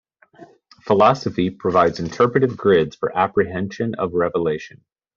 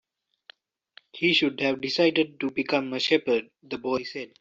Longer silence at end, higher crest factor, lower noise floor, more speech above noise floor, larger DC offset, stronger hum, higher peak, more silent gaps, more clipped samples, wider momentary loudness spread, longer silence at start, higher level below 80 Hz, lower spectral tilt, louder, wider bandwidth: first, 0.5 s vs 0.15 s; about the same, 18 dB vs 18 dB; second, -47 dBFS vs -57 dBFS; second, 28 dB vs 32 dB; neither; neither; first, -2 dBFS vs -8 dBFS; neither; neither; about the same, 9 LU vs 11 LU; second, 0.4 s vs 1.15 s; first, -54 dBFS vs -70 dBFS; about the same, -5.5 dB/octave vs -4.5 dB/octave; first, -19 LUFS vs -25 LUFS; about the same, 7.2 kHz vs 7.8 kHz